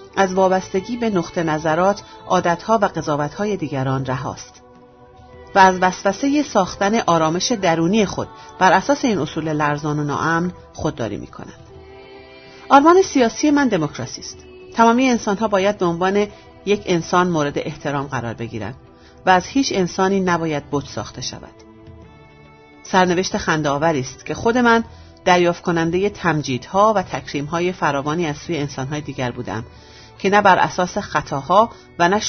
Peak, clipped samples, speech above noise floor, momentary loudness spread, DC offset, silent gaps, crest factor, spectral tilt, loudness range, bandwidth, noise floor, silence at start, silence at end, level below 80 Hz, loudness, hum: 0 dBFS; under 0.1%; 27 dB; 13 LU; under 0.1%; none; 18 dB; -5 dB/octave; 5 LU; 6.6 kHz; -46 dBFS; 0 s; 0 s; -48 dBFS; -18 LUFS; none